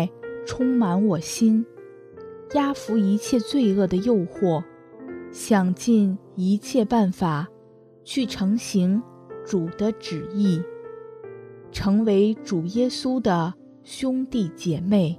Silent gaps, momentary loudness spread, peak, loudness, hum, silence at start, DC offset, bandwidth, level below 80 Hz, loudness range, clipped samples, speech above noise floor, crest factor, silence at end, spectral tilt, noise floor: none; 19 LU; -6 dBFS; -23 LUFS; none; 0 s; under 0.1%; 14 kHz; -54 dBFS; 3 LU; under 0.1%; 29 dB; 16 dB; 0 s; -6.5 dB/octave; -51 dBFS